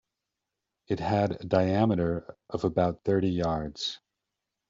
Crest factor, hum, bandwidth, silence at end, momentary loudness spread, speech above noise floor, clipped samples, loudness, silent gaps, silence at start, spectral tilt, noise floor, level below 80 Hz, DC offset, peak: 20 dB; none; 7.6 kHz; 0.75 s; 9 LU; 59 dB; under 0.1%; -28 LUFS; none; 0.9 s; -6 dB/octave; -86 dBFS; -54 dBFS; under 0.1%; -10 dBFS